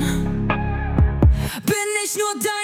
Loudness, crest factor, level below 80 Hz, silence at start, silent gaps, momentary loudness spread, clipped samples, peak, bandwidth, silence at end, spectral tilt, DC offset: -20 LUFS; 14 dB; -24 dBFS; 0 s; none; 6 LU; under 0.1%; -6 dBFS; 17 kHz; 0 s; -5 dB/octave; under 0.1%